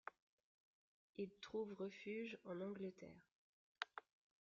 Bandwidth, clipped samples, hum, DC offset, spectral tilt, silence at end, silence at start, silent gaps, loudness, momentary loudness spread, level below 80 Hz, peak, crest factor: 7.2 kHz; under 0.1%; none; under 0.1%; -4 dB/octave; 0.4 s; 0.05 s; 0.22-1.14 s, 3.31-3.75 s; -52 LUFS; 12 LU; -88 dBFS; -24 dBFS; 30 dB